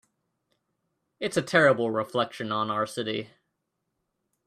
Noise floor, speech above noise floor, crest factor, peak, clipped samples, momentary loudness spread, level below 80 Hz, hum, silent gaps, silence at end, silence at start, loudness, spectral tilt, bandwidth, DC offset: -80 dBFS; 54 dB; 24 dB; -6 dBFS; under 0.1%; 13 LU; -70 dBFS; none; none; 1.2 s; 1.2 s; -26 LUFS; -5 dB/octave; 14 kHz; under 0.1%